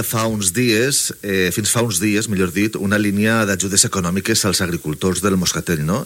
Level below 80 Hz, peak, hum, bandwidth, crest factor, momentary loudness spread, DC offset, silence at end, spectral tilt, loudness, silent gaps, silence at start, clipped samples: -46 dBFS; 0 dBFS; none; 17 kHz; 18 dB; 5 LU; under 0.1%; 0 s; -3.5 dB/octave; -17 LUFS; none; 0 s; under 0.1%